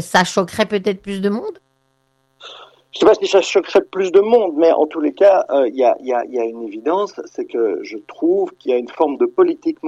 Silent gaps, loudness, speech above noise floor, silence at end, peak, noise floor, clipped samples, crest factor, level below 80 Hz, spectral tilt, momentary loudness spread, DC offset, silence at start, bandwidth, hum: none; -17 LUFS; 47 dB; 0 s; -2 dBFS; -64 dBFS; under 0.1%; 14 dB; -60 dBFS; -5 dB/octave; 12 LU; under 0.1%; 0 s; 12.5 kHz; none